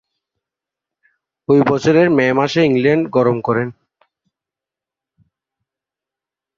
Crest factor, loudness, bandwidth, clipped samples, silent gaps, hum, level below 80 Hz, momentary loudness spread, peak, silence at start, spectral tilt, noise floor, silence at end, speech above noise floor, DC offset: 16 dB; -15 LUFS; 7.6 kHz; under 0.1%; none; none; -56 dBFS; 7 LU; -2 dBFS; 1.5 s; -7 dB/octave; -87 dBFS; 2.85 s; 73 dB; under 0.1%